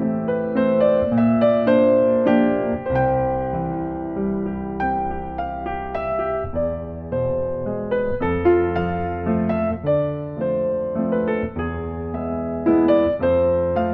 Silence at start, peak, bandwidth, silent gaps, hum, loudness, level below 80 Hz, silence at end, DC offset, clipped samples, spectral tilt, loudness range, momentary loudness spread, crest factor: 0 s; -6 dBFS; 4.6 kHz; none; none; -21 LUFS; -40 dBFS; 0 s; under 0.1%; under 0.1%; -10.5 dB/octave; 7 LU; 10 LU; 14 dB